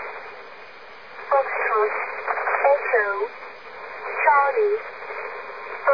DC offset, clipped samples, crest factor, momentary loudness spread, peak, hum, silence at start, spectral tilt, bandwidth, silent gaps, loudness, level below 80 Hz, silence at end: 0.4%; under 0.1%; 20 dB; 20 LU; -4 dBFS; none; 0 s; -4.5 dB/octave; 5.4 kHz; none; -22 LUFS; -74 dBFS; 0 s